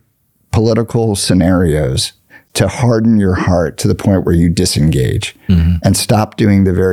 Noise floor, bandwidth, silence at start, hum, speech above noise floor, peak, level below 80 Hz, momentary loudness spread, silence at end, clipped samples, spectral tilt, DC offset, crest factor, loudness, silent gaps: -58 dBFS; 16 kHz; 0.55 s; none; 47 dB; 0 dBFS; -32 dBFS; 5 LU; 0 s; under 0.1%; -6 dB/octave; under 0.1%; 12 dB; -13 LUFS; none